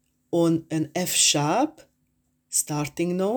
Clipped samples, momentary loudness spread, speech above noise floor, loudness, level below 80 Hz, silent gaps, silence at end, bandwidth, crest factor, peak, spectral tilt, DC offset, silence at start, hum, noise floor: under 0.1%; 10 LU; 47 dB; -23 LUFS; -64 dBFS; none; 0 s; over 20 kHz; 18 dB; -6 dBFS; -3.5 dB/octave; under 0.1%; 0.3 s; none; -71 dBFS